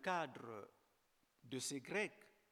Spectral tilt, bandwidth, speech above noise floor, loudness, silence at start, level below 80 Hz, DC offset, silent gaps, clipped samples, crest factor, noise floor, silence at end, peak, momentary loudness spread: -3 dB/octave; 18 kHz; 35 dB; -46 LUFS; 0 s; under -90 dBFS; under 0.1%; none; under 0.1%; 22 dB; -80 dBFS; 0.25 s; -26 dBFS; 13 LU